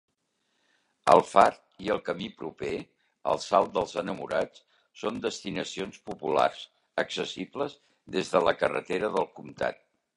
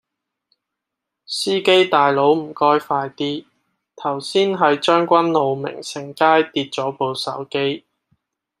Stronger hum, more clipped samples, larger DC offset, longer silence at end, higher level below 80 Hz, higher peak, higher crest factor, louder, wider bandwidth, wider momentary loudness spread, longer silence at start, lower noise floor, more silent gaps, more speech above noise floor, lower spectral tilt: neither; neither; neither; second, 0.4 s vs 0.8 s; first, -62 dBFS vs -70 dBFS; about the same, -2 dBFS vs -2 dBFS; first, 26 dB vs 18 dB; second, -29 LUFS vs -18 LUFS; second, 11.5 kHz vs 14.5 kHz; about the same, 14 LU vs 12 LU; second, 1.05 s vs 1.3 s; second, -76 dBFS vs -82 dBFS; neither; second, 49 dB vs 64 dB; about the same, -4.5 dB/octave vs -4.5 dB/octave